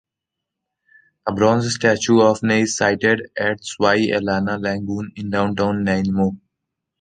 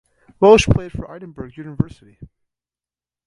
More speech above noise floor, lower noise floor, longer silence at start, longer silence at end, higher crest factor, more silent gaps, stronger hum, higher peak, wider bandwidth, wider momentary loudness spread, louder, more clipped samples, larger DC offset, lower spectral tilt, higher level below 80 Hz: second, 65 dB vs over 73 dB; second, -83 dBFS vs under -90 dBFS; first, 1.25 s vs 0.4 s; second, 0.65 s vs 1 s; about the same, 18 dB vs 20 dB; neither; neither; about the same, -2 dBFS vs 0 dBFS; second, 9.6 kHz vs 11.5 kHz; second, 9 LU vs 22 LU; second, -19 LUFS vs -16 LUFS; neither; neither; about the same, -5 dB/octave vs -6 dB/octave; second, -50 dBFS vs -36 dBFS